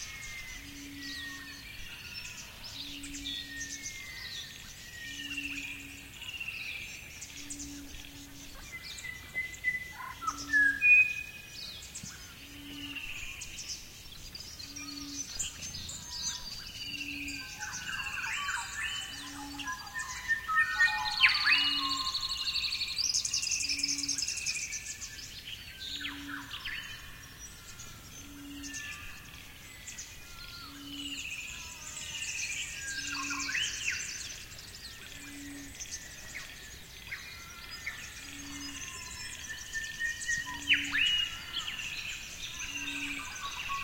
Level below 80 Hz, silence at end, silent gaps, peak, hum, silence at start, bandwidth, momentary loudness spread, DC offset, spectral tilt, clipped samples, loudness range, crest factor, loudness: -56 dBFS; 0 s; none; -10 dBFS; none; 0 s; 16.5 kHz; 17 LU; under 0.1%; 0 dB/octave; under 0.1%; 14 LU; 26 dB; -33 LUFS